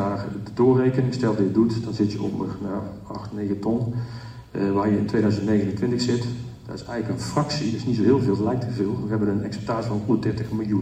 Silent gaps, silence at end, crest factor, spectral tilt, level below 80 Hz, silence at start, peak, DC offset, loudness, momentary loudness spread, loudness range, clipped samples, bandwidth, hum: none; 0 s; 16 dB; -7.5 dB/octave; -52 dBFS; 0 s; -6 dBFS; under 0.1%; -24 LUFS; 12 LU; 3 LU; under 0.1%; 10.5 kHz; none